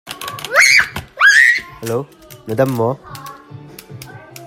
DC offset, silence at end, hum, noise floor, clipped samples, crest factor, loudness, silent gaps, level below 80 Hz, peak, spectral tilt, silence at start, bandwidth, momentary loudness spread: under 0.1%; 0 s; none; -36 dBFS; under 0.1%; 16 dB; -12 LUFS; none; -52 dBFS; 0 dBFS; -2.5 dB/octave; 0.05 s; 16.5 kHz; 26 LU